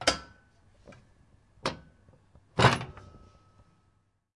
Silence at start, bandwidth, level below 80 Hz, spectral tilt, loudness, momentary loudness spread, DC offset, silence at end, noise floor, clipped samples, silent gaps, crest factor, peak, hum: 0 s; 11.5 kHz; -56 dBFS; -4 dB/octave; -28 LUFS; 23 LU; under 0.1%; 1.45 s; -71 dBFS; under 0.1%; none; 28 dB; -6 dBFS; none